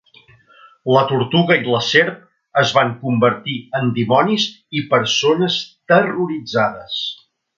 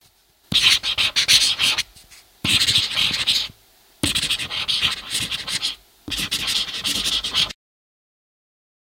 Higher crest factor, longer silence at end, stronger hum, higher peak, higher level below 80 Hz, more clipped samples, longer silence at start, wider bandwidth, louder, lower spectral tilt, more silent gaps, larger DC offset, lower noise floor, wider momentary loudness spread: about the same, 18 dB vs 22 dB; second, 0.45 s vs 1.45 s; neither; about the same, 0 dBFS vs -2 dBFS; second, -60 dBFS vs -48 dBFS; neither; first, 0.85 s vs 0.5 s; second, 7.6 kHz vs 17 kHz; about the same, -17 LUFS vs -18 LUFS; first, -5 dB/octave vs 0 dB/octave; neither; neither; second, -50 dBFS vs -57 dBFS; about the same, 9 LU vs 11 LU